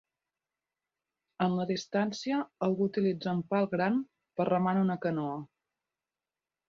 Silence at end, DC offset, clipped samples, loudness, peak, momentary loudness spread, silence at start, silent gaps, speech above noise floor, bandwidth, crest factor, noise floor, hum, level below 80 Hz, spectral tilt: 1.25 s; under 0.1%; under 0.1%; -31 LUFS; -16 dBFS; 5 LU; 1.4 s; none; over 60 dB; 7.2 kHz; 16 dB; under -90 dBFS; none; -74 dBFS; -7 dB/octave